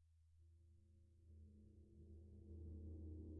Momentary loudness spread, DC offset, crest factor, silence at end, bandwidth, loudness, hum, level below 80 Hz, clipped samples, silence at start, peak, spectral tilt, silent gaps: 12 LU; under 0.1%; 14 dB; 0 s; 1 kHz; -61 LUFS; none; -66 dBFS; under 0.1%; 0 s; -46 dBFS; -14.5 dB/octave; none